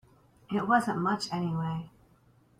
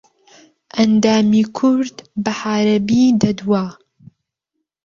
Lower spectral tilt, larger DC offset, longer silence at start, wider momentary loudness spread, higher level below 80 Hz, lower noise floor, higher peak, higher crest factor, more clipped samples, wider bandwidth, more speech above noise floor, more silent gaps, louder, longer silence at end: about the same, -6 dB/octave vs -6 dB/octave; neither; second, 0.5 s vs 0.75 s; about the same, 11 LU vs 10 LU; second, -64 dBFS vs -54 dBFS; second, -63 dBFS vs -77 dBFS; second, -12 dBFS vs -2 dBFS; about the same, 20 dB vs 16 dB; neither; first, 14.5 kHz vs 7.4 kHz; second, 34 dB vs 62 dB; neither; second, -30 LUFS vs -16 LUFS; second, 0.7 s vs 1.15 s